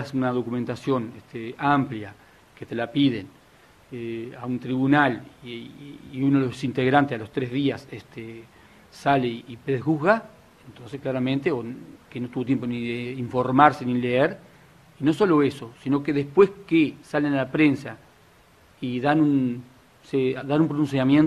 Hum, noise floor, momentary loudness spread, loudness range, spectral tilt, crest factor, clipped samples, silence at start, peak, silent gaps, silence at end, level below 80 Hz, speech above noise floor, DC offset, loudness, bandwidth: none; -55 dBFS; 18 LU; 5 LU; -7.5 dB/octave; 24 dB; under 0.1%; 0 s; 0 dBFS; none; 0 s; -60 dBFS; 32 dB; under 0.1%; -24 LUFS; 11.5 kHz